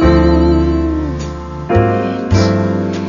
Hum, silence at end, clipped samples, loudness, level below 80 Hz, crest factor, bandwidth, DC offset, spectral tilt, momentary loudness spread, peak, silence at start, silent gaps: none; 0 s; under 0.1%; -14 LUFS; -20 dBFS; 12 dB; 7.4 kHz; under 0.1%; -7.5 dB/octave; 11 LU; 0 dBFS; 0 s; none